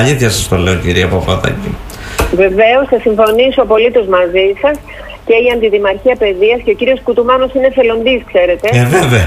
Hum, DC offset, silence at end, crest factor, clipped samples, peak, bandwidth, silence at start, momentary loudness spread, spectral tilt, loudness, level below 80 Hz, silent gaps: none; under 0.1%; 0 s; 10 dB; under 0.1%; 0 dBFS; 15.5 kHz; 0 s; 6 LU; -5 dB/octave; -11 LUFS; -28 dBFS; none